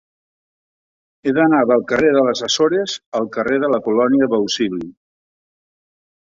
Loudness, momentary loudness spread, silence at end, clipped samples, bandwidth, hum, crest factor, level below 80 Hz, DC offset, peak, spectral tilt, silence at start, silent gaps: -17 LUFS; 9 LU; 1.4 s; under 0.1%; 7.8 kHz; none; 16 dB; -58 dBFS; under 0.1%; -2 dBFS; -4 dB/octave; 1.25 s; 3.06-3.12 s